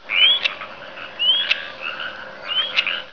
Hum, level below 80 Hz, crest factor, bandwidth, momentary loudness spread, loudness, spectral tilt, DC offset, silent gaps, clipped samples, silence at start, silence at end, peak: none; -62 dBFS; 20 dB; 5.4 kHz; 19 LU; -18 LUFS; -0.5 dB/octave; 0.4%; none; under 0.1%; 0.05 s; 0 s; -2 dBFS